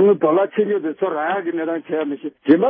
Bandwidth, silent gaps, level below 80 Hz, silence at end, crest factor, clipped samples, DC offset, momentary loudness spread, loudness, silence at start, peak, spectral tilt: 3.7 kHz; none; -70 dBFS; 0 s; 16 dB; under 0.1%; under 0.1%; 8 LU; -20 LUFS; 0 s; -2 dBFS; -11.5 dB/octave